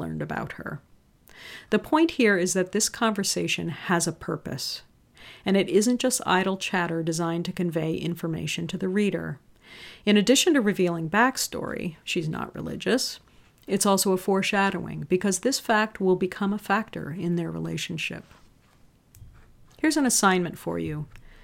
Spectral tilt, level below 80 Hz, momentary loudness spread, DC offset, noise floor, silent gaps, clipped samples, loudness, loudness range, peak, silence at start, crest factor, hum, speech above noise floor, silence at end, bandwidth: -4 dB/octave; -56 dBFS; 12 LU; under 0.1%; -58 dBFS; none; under 0.1%; -25 LUFS; 4 LU; -6 dBFS; 0 s; 20 dB; none; 33 dB; 0 s; 17 kHz